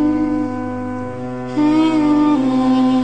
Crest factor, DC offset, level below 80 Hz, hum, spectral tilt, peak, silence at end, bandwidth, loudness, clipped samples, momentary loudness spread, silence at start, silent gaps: 10 dB; 1%; -48 dBFS; none; -7 dB/octave; -6 dBFS; 0 s; 9 kHz; -17 LUFS; under 0.1%; 11 LU; 0 s; none